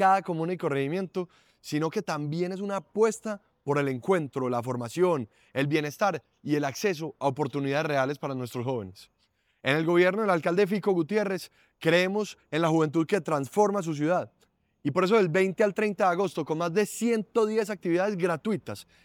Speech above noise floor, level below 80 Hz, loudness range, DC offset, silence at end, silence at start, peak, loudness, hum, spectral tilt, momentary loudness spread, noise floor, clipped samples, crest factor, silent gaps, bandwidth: 45 dB; -74 dBFS; 4 LU; under 0.1%; 0.2 s; 0 s; -10 dBFS; -27 LUFS; none; -6 dB/octave; 10 LU; -72 dBFS; under 0.1%; 18 dB; none; 17.5 kHz